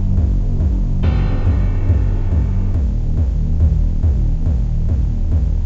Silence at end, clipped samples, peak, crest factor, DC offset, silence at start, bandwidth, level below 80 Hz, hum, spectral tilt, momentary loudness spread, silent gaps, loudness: 0 s; under 0.1%; -4 dBFS; 12 dB; 0.2%; 0 s; 4.3 kHz; -16 dBFS; none; -9.5 dB/octave; 2 LU; none; -18 LUFS